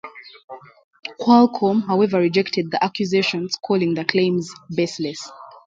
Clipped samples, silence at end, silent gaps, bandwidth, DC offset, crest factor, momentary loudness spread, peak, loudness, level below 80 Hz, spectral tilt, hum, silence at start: under 0.1%; 0.15 s; 0.44-0.48 s, 0.84-0.91 s; 7.8 kHz; under 0.1%; 20 dB; 20 LU; 0 dBFS; -19 LUFS; -66 dBFS; -5.5 dB/octave; none; 0.05 s